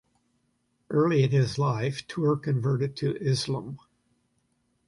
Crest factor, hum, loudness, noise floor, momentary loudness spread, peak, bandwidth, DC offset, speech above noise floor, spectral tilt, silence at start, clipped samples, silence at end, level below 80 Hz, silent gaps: 16 dB; none; -27 LUFS; -73 dBFS; 9 LU; -12 dBFS; 11.5 kHz; under 0.1%; 47 dB; -7 dB/octave; 0.9 s; under 0.1%; 1.1 s; -62 dBFS; none